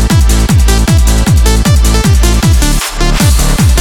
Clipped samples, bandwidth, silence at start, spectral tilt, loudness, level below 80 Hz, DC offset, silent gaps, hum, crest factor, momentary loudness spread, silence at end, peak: under 0.1%; 17 kHz; 0 s; -4.5 dB/octave; -9 LUFS; -8 dBFS; under 0.1%; none; none; 6 dB; 2 LU; 0 s; 0 dBFS